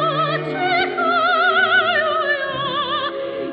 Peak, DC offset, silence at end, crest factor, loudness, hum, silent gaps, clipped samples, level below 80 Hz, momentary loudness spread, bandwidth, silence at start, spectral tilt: -6 dBFS; under 0.1%; 0 s; 14 dB; -18 LUFS; none; none; under 0.1%; -60 dBFS; 7 LU; 5.6 kHz; 0 s; -7 dB/octave